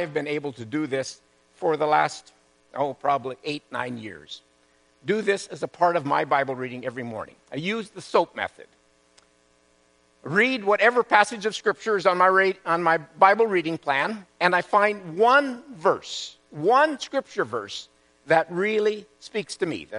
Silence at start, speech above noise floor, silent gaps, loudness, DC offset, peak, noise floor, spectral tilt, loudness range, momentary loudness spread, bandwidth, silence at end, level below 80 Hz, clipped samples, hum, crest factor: 0 s; 38 dB; none; -23 LUFS; under 0.1%; 0 dBFS; -62 dBFS; -4.5 dB/octave; 8 LU; 15 LU; 10.5 kHz; 0 s; -72 dBFS; under 0.1%; none; 24 dB